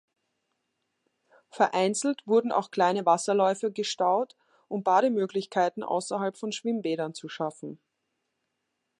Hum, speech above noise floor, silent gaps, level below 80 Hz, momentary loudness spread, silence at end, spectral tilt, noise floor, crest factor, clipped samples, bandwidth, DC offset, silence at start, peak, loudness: none; 54 dB; none; -84 dBFS; 11 LU; 1.25 s; -4 dB/octave; -81 dBFS; 20 dB; under 0.1%; 11.5 kHz; under 0.1%; 1.55 s; -8 dBFS; -27 LUFS